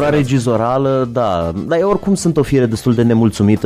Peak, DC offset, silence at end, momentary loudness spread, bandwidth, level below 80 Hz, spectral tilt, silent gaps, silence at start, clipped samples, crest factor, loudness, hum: -2 dBFS; under 0.1%; 0 s; 3 LU; 15 kHz; -38 dBFS; -7 dB/octave; none; 0 s; under 0.1%; 12 dB; -15 LUFS; none